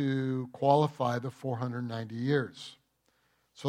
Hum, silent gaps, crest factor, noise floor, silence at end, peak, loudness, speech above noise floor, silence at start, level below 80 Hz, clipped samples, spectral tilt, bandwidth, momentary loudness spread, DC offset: none; none; 22 dB; -73 dBFS; 0 s; -10 dBFS; -31 LUFS; 43 dB; 0 s; -78 dBFS; under 0.1%; -7.5 dB/octave; 12.5 kHz; 13 LU; under 0.1%